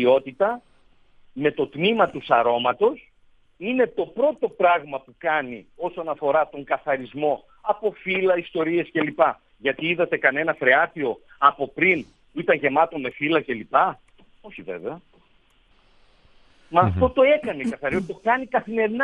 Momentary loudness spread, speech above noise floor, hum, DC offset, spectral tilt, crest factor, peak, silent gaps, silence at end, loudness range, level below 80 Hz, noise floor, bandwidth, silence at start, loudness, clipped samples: 13 LU; 37 dB; none; under 0.1%; -7 dB/octave; 22 dB; -2 dBFS; none; 0 s; 5 LU; -56 dBFS; -59 dBFS; 9 kHz; 0 s; -22 LUFS; under 0.1%